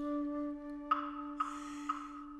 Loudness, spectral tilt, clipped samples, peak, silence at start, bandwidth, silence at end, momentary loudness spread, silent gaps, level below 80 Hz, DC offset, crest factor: -39 LUFS; -4 dB/octave; under 0.1%; -18 dBFS; 0 s; 10.5 kHz; 0 s; 6 LU; none; -64 dBFS; under 0.1%; 20 dB